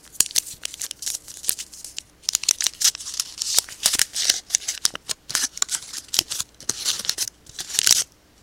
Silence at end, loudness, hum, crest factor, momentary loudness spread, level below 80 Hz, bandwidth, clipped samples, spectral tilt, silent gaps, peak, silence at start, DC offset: 0.35 s; -22 LUFS; none; 26 dB; 11 LU; -58 dBFS; 17 kHz; under 0.1%; 2 dB/octave; none; 0 dBFS; 0.05 s; under 0.1%